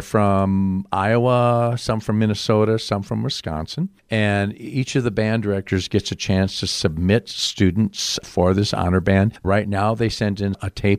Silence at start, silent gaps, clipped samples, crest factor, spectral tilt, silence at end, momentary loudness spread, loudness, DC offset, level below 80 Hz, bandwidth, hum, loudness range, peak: 0 s; none; under 0.1%; 16 dB; -5.5 dB/octave; 0 s; 6 LU; -20 LUFS; under 0.1%; -44 dBFS; 14.5 kHz; none; 3 LU; -4 dBFS